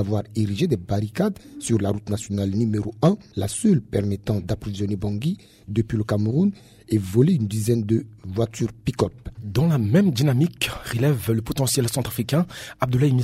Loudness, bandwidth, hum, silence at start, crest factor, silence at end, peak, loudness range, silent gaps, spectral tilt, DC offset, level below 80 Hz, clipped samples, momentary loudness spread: -23 LUFS; 16 kHz; none; 0 s; 18 dB; 0 s; -4 dBFS; 2 LU; none; -6.5 dB/octave; under 0.1%; -46 dBFS; under 0.1%; 8 LU